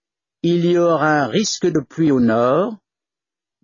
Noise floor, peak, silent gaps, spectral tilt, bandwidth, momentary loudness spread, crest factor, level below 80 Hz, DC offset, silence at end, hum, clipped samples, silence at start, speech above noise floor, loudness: -89 dBFS; -4 dBFS; none; -5.5 dB/octave; 7.4 kHz; 5 LU; 14 dB; -60 dBFS; under 0.1%; 0.9 s; none; under 0.1%; 0.45 s; 73 dB; -17 LUFS